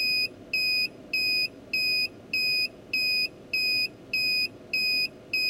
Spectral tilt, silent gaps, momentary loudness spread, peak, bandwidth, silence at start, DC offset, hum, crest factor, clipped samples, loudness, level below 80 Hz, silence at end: -1 dB/octave; none; 4 LU; -16 dBFS; 16 kHz; 0 s; under 0.1%; none; 12 dB; under 0.1%; -25 LUFS; -64 dBFS; 0 s